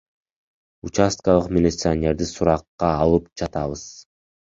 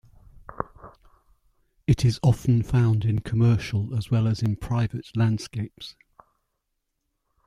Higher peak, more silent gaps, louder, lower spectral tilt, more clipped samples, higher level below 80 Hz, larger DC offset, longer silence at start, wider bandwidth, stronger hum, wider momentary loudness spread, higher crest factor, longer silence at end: first, -2 dBFS vs -6 dBFS; first, 2.68-2.78 s vs none; first, -21 LUFS vs -24 LUFS; second, -6 dB/octave vs -7.5 dB/octave; neither; first, -38 dBFS vs -46 dBFS; neither; first, 0.85 s vs 0.5 s; second, 7.8 kHz vs 11.5 kHz; neither; second, 11 LU vs 15 LU; about the same, 20 dB vs 18 dB; second, 0.4 s vs 1.55 s